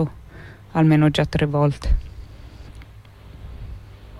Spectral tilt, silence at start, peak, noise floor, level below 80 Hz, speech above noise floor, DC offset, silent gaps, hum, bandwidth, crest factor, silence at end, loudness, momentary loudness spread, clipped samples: -7.5 dB/octave; 0 s; -6 dBFS; -43 dBFS; -30 dBFS; 25 dB; under 0.1%; none; none; 11.5 kHz; 16 dB; 0 s; -20 LUFS; 25 LU; under 0.1%